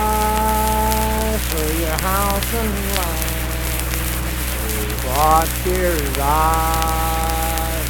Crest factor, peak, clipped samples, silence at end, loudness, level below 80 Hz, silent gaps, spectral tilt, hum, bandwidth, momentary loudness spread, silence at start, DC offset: 18 dB; 0 dBFS; under 0.1%; 0 s; -19 LUFS; -24 dBFS; none; -4 dB/octave; none; 19.5 kHz; 6 LU; 0 s; under 0.1%